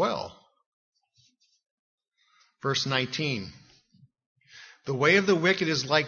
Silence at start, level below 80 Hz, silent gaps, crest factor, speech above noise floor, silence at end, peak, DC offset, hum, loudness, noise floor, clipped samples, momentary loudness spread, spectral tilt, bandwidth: 0 s; -68 dBFS; 0.66-0.92 s, 1.71-1.98 s, 4.26-4.36 s; 24 dB; 42 dB; 0 s; -6 dBFS; under 0.1%; none; -25 LUFS; -67 dBFS; under 0.1%; 16 LU; -4.5 dB/octave; 7.2 kHz